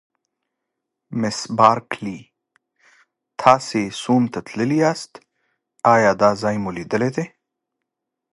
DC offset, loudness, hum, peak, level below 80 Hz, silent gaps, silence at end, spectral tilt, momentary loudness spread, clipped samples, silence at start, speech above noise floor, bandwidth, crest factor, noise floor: under 0.1%; -19 LUFS; none; 0 dBFS; -60 dBFS; none; 1.05 s; -5.5 dB/octave; 15 LU; under 0.1%; 1.1 s; 63 dB; 11.5 kHz; 22 dB; -81 dBFS